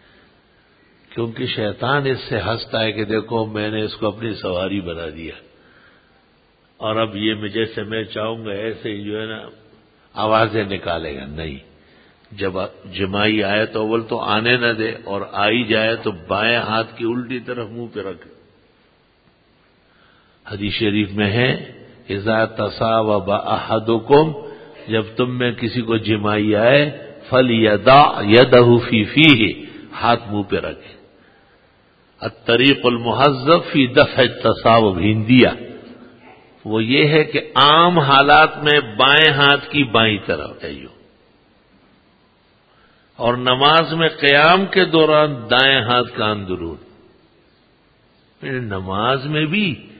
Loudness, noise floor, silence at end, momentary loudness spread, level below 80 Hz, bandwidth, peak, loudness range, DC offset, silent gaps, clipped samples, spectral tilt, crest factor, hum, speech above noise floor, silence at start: -16 LUFS; -56 dBFS; 0.15 s; 17 LU; -48 dBFS; 8 kHz; 0 dBFS; 12 LU; under 0.1%; none; under 0.1%; -8 dB/octave; 18 dB; none; 40 dB; 1.15 s